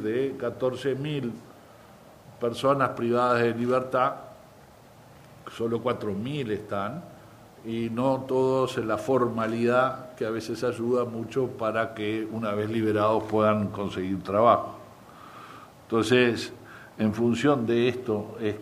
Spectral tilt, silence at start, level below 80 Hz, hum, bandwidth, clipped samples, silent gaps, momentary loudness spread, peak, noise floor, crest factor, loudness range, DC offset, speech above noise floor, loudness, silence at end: -6.5 dB/octave; 0 s; -62 dBFS; none; 15.5 kHz; under 0.1%; none; 17 LU; -6 dBFS; -52 dBFS; 22 dB; 5 LU; under 0.1%; 26 dB; -26 LUFS; 0 s